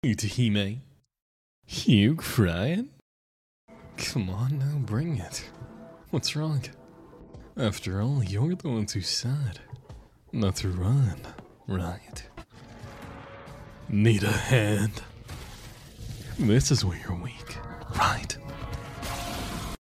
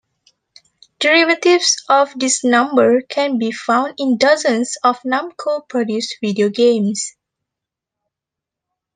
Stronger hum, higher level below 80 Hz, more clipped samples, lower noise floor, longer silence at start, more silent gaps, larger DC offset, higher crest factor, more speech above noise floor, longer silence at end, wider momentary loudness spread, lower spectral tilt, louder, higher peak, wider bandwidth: neither; first, -46 dBFS vs -70 dBFS; neither; second, -49 dBFS vs -85 dBFS; second, 0.05 s vs 1 s; first, 1.22-1.62 s, 3.02-3.68 s vs none; neither; about the same, 20 dB vs 16 dB; second, 23 dB vs 69 dB; second, 0.1 s vs 1.85 s; first, 21 LU vs 8 LU; first, -5.5 dB/octave vs -3 dB/octave; second, -28 LUFS vs -16 LUFS; second, -8 dBFS vs 0 dBFS; first, 15.5 kHz vs 10 kHz